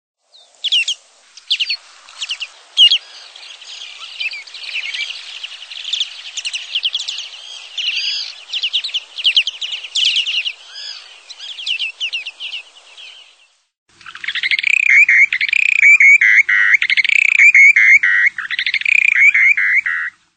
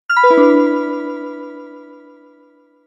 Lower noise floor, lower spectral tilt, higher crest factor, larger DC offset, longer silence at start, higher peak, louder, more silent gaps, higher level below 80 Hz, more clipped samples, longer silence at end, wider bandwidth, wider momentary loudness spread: about the same, -53 dBFS vs -51 dBFS; second, 4.5 dB/octave vs -4.5 dB/octave; about the same, 16 dB vs 16 dB; neither; first, 0.65 s vs 0.1 s; about the same, 0 dBFS vs 0 dBFS; about the same, -12 LUFS vs -13 LUFS; first, 13.77-13.86 s vs none; about the same, -72 dBFS vs -72 dBFS; neither; second, 0.25 s vs 1.05 s; about the same, 9.2 kHz vs 10 kHz; second, 21 LU vs 24 LU